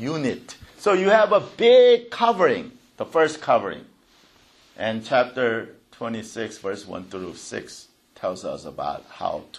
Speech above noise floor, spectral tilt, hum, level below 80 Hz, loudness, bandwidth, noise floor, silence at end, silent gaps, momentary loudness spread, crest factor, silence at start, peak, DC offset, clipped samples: 35 dB; -4.5 dB/octave; none; -64 dBFS; -21 LUFS; 11.5 kHz; -57 dBFS; 0 s; none; 18 LU; 18 dB; 0 s; -4 dBFS; under 0.1%; under 0.1%